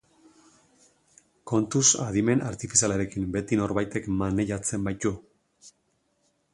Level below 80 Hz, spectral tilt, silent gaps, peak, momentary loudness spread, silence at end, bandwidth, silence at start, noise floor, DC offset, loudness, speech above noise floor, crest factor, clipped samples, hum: -50 dBFS; -4 dB/octave; none; -4 dBFS; 9 LU; 0.85 s; 11.5 kHz; 1.45 s; -72 dBFS; under 0.1%; -25 LUFS; 46 dB; 24 dB; under 0.1%; none